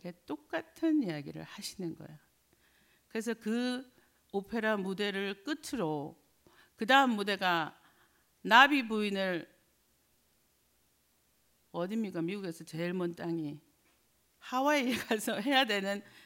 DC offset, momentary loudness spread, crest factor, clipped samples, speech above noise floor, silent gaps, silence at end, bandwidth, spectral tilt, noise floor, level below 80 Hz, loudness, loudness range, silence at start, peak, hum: under 0.1%; 17 LU; 26 dB; under 0.1%; 40 dB; none; 0.25 s; 16 kHz; -4 dB/octave; -72 dBFS; -76 dBFS; -32 LUFS; 11 LU; 0.05 s; -8 dBFS; none